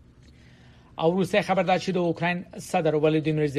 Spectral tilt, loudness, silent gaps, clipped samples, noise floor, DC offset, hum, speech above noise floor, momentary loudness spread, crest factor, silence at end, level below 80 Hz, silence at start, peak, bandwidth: -6.5 dB/octave; -24 LUFS; none; under 0.1%; -52 dBFS; under 0.1%; none; 28 dB; 6 LU; 18 dB; 0 s; -58 dBFS; 0.95 s; -8 dBFS; 13.5 kHz